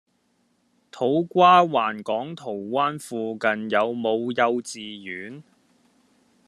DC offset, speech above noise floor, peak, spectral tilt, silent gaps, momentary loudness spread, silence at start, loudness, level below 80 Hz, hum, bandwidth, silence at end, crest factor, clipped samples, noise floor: under 0.1%; 45 dB; -4 dBFS; -5 dB/octave; none; 18 LU; 0.95 s; -22 LUFS; -74 dBFS; none; 13 kHz; 1.05 s; 20 dB; under 0.1%; -68 dBFS